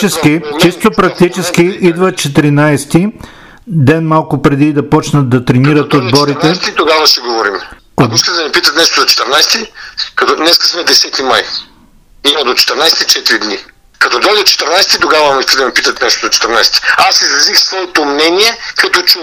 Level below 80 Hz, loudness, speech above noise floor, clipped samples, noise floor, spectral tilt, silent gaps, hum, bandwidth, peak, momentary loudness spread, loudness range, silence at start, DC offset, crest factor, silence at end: -40 dBFS; -8 LUFS; 33 dB; 0.4%; -42 dBFS; -3.5 dB/octave; none; none; over 20 kHz; 0 dBFS; 6 LU; 3 LU; 0 s; under 0.1%; 10 dB; 0 s